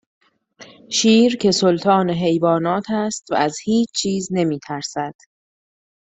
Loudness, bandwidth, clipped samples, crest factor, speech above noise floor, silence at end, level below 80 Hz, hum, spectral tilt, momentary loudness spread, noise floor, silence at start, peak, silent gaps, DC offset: -18 LUFS; 8.4 kHz; under 0.1%; 18 dB; 28 dB; 0.95 s; -58 dBFS; none; -4.5 dB/octave; 11 LU; -46 dBFS; 0.6 s; -2 dBFS; none; under 0.1%